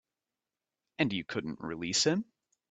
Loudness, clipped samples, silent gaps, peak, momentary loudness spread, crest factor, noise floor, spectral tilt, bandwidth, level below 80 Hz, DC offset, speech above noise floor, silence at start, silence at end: -32 LUFS; under 0.1%; none; -14 dBFS; 15 LU; 20 dB; under -90 dBFS; -3.5 dB/octave; 9 kHz; -70 dBFS; under 0.1%; over 58 dB; 1 s; 0.45 s